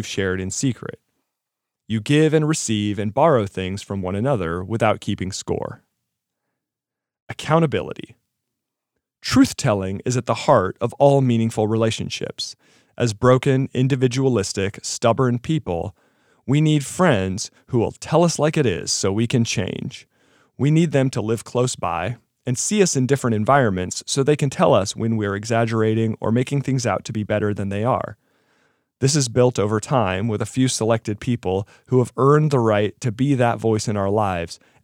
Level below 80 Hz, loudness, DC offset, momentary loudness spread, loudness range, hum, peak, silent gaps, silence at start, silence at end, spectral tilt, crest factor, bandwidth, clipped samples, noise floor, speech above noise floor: -56 dBFS; -20 LUFS; under 0.1%; 10 LU; 4 LU; none; -2 dBFS; 7.22-7.27 s; 0 s; 0.3 s; -5.5 dB/octave; 18 dB; 16 kHz; under 0.1%; -86 dBFS; 67 dB